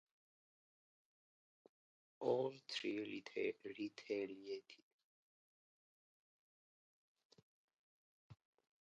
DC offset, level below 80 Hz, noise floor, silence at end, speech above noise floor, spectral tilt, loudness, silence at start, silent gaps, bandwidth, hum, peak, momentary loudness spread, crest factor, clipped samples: under 0.1%; under -90 dBFS; under -90 dBFS; 0.45 s; over 45 dB; -3 dB/octave; -45 LUFS; 2.2 s; 4.83-7.15 s, 7.25-7.30 s, 7.42-7.68 s, 7.77-8.30 s; 8 kHz; none; -28 dBFS; 11 LU; 22 dB; under 0.1%